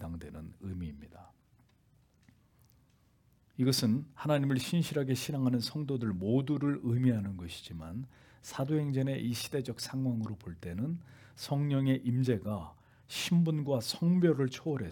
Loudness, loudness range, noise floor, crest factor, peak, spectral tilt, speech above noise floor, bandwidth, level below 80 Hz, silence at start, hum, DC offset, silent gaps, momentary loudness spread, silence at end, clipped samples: -33 LUFS; 6 LU; -67 dBFS; 18 dB; -16 dBFS; -6.5 dB/octave; 36 dB; 18 kHz; -64 dBFS; 0 s; none; under 0.1%; none; 14 LU; 0 s; under 0.1%